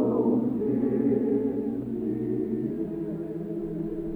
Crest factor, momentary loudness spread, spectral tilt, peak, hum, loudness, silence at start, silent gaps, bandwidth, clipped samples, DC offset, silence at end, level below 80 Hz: 14 dB; 8 LU; -11.5 dB/octave; -12 dBFS; none; -28 LUFS; 0 s; none; 3.7 kHz; under 0.1%; under 0.1%; 0 s; -52 dBFS